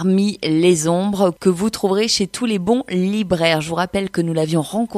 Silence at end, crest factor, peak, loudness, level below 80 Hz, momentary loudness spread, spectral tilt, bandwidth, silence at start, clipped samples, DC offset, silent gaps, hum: 0 s; 14 dB; -2 dBFS; -18 LUFS; -52 dBFS; 5 LU; -5 dB/octave; 14.5 kHz; 0 s; under 0.1%; under 0.1%; none; none